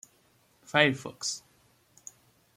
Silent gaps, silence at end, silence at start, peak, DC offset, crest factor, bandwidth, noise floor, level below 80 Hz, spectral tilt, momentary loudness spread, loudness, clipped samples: none; 1.2 s; 0.7 s; -6 dBFS; under 0.1%; 26 dB; 16 kHz; -66 dBFS; -72 dBFS; -3 dB/octave; 25 LU; -28 LUFS; under 0.1%